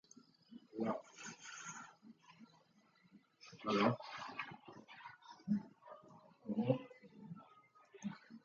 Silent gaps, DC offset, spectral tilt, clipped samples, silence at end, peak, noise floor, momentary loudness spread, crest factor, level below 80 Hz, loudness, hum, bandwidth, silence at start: none; under 0.1%; -5.5 dB/octave; under 0.1%; 0.05 s; -20 dBFS; -72 dBFS; 25 LU; 26 dB; -84 dBFS; -43 LUFS; none; 7.6 kHz; 0.5 s